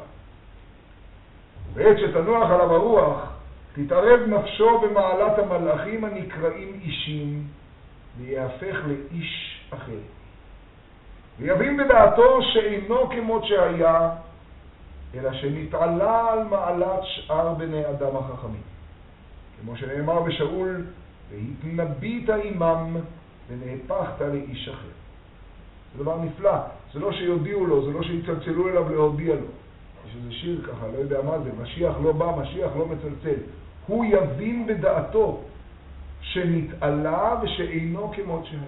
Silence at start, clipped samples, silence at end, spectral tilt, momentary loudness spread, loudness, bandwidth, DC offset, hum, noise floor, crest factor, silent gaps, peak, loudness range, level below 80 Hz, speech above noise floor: 0 s; under 0.1%; 0 s; -5 dB/octave; 19 LU; -23 LUFS; 4.1 kHz; under 0.1%; none; -48 dBFS; 22 dB; none; 0 dBFS; 11 LU; -44 dBFS; 26 dB